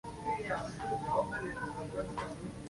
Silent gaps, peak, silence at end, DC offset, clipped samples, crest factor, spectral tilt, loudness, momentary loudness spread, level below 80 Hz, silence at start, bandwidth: none; -20 dBFS; 0 s; under 0.1%; under 0.1%; 18 dB; -5.5 dB/octave; -37 LUFS; 6 LU; -56 dBFS; 0.05 s; 11.5 kHz